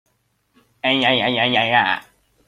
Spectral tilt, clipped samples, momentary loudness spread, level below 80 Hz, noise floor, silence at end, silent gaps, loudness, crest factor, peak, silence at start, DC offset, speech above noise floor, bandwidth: -5 dB/octave; under 0.1%; 7 LU; -60 dBFS; -66 dBFS; 0.45 s; none; -17 LUFS; 18 dB; -2 dBFS; 0.85 s; under 0.1%; 49 dB; 13.5 kHz